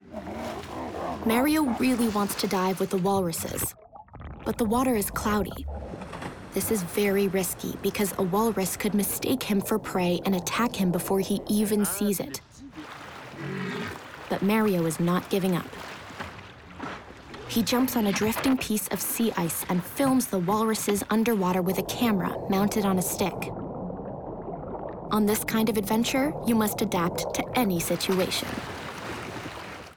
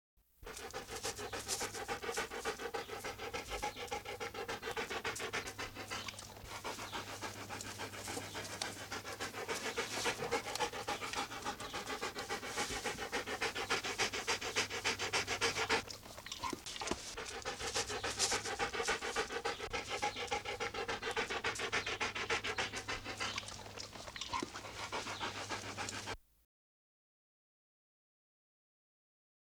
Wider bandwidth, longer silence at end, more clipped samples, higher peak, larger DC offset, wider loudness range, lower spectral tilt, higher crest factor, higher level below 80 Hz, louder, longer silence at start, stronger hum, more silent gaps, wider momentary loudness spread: about the same, over 20 kHz vs over 20 kHz; second, 0 s vs 3.2 s; neither; first, -12 dBFS vs -18 dBFS; neither; second, 4 LU vs 7 LU; first, -4.5 dB/octave vs -1.5 dB/octave; second, 16 dB vs 24 dB; first, -50 dBFS vs -62 dBFS; first, -27 LUFS vs -40 LUFS; second, 0.05 s vs 0.4 s; neither; neither; first, 14 LU vs 9 LU